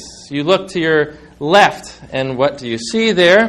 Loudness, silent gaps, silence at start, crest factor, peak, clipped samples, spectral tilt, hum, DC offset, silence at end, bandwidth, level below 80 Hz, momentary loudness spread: -15 LUFS; none; 0 s; 14 dB; 0 dBFS; 0.2%; -4.5 dB/octave; none; under 0.1%; 0 s; 12.5 kHz; -50 dBFS; 14 LU